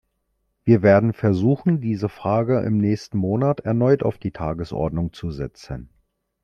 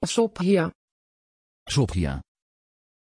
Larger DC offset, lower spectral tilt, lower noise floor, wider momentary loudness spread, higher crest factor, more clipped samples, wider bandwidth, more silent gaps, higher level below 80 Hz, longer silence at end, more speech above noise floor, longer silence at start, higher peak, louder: neither; first, -9 dB/octave vs -5.5 dB/octave; second, -72 dBFS vs under -90 dBFS; first, 13 LU vs 8 LU; about the same, 18 dB vs 18 dB; neither; second, 7.2 kHz vs 11 kHz; second, none vs 0.75-1.66 s; about the same, -46 dBFS vs -44 dBFS; second, 0.6 s vs 0.9 s; second, 52 dB vs over 67 dB; first, 0.65 s vs 0 s; first, -4 dBFS vs -8 dBFS; first, -21 LUFS vs -25 LUFS